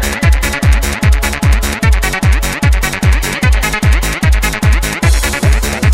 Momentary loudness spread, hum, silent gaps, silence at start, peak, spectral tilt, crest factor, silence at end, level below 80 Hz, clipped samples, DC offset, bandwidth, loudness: 1 LU; none; none; 0 s; 0 dBFS; -4.5 dB/octave; 10 dB; 0 s; -12 dBFS; under 0.1%; under 0.1%; 17 kHz; -12 LUFS